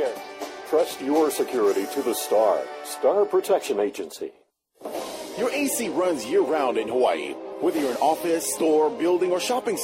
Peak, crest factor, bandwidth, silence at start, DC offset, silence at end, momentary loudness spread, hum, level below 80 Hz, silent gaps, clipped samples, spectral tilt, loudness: -8 dBFS; 14 dB; 16 kHz; 0 s; under 0.1%; 0 s; 12 LU; none; -68 dBFS; none; under 0.1%; -3 dB/octave; -24 LUFS